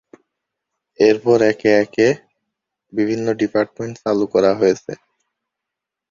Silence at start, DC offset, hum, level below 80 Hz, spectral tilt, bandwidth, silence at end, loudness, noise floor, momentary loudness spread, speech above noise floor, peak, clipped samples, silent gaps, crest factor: 1 s; under 0.1%; none; -58 dBFS; -6 dB/octave; 7.4 kHz; 1.15 s; -17 LUFS; -83 dBFS; 11 LU; 67 dB; -2 dBFS; under 0.1%; none; 18 dB